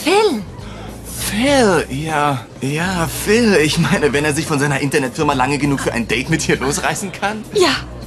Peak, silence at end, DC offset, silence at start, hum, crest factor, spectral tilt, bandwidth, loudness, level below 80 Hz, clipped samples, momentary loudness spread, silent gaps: -2 dBFS; 0 s; under 0.1%; 0 s; none; 16 dB; -4.5 dB/octave; 13.5 kHz; -16 LUFS; -36 dBFS; under 0.1%; 9 LU; none